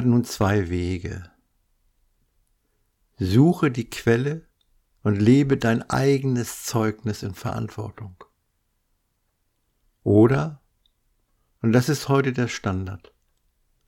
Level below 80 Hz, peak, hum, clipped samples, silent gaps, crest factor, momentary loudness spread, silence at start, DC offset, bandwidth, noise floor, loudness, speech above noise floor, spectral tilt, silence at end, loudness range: -50 dBFS; -6 dBFS; none; under 0.1%; none; 18 dB; 16 LU; 0 s; under 0.1%; 17 kHz; -72 dBFS; -22 LUFS; 50 dB; -6.5 dB/octave; 0.9 s; 7 LU